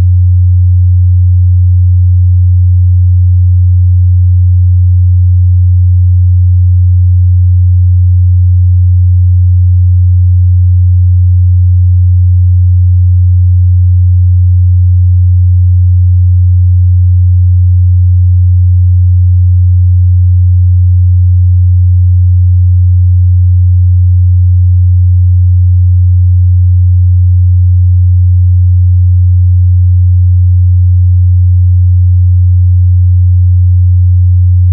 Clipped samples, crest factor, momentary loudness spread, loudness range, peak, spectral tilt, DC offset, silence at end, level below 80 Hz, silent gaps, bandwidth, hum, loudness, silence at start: under 0.1%; 4 dB; 0 LU; 0 LU; -2 dBFS; -28.5 dB/octave; under 0.1%; 0 s; -18 dBFS; none; 0.2 kHz; none; -7 LUFS; 0 s